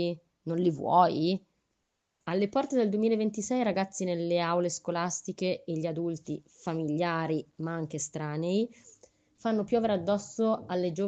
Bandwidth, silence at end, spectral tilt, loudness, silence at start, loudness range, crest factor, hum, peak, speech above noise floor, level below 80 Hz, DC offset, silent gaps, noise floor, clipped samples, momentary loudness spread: 9 kHz; 0 s; -5.5 dB/octave; -30 LUFS; 0 s; 4 LU; 20 dB; none; -10 dBFS; 51 dB; -72 dBFS; under 0.1%; none; -80 dBFS; under 0.1%; 9 LU